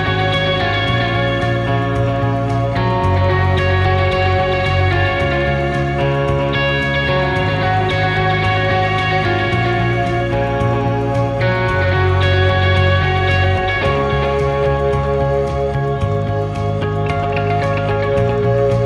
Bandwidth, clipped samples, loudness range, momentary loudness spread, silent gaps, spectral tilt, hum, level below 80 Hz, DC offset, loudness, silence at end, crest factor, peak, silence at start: 9.4 kHz; under 0.1%; 3 LU; 3 LU; none; -7 dB/octave; none; -30 dBFS; under 0.1%; -16 LUFS; 0 s; 14 dB; -2 dBFS; 0 s